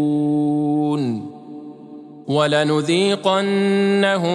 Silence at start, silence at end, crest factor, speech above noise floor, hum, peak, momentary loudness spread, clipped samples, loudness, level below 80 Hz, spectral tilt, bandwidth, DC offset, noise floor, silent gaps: 0 s; 0 s; 16 dB; 21 dB; none; -2 dBFS; 19 LU; under 0.1%; -18 LUFS; -72 dBFS; -6 dB/octave; 11 kHz; under 0.1%; -38 dBFS; none